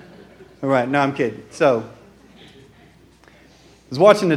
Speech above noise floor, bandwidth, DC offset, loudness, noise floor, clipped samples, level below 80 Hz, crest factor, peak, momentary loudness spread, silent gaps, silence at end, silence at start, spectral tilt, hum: 33 dB; 13.5 kHz; under 0.1%; -19 LUFS; -50 dBFS; under 0.1%; -60 dBFS; 20 dB; 0 dBFS; 15 LU; none; 0 s; 0.6 s; -6 dB/octave; none